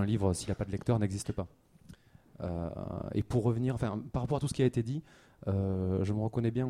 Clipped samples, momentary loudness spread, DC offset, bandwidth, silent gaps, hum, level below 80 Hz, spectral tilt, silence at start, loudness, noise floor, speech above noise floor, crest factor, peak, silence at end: under 0.1%; 9 LU; under 0.1%; 13.5 kHz; none; none; -52 dBFS; -7.5 dB/octave; 0 s; -33 LUFS; -56 dBFS; 24 dB; 16 dB; -16 dBFS; 0 s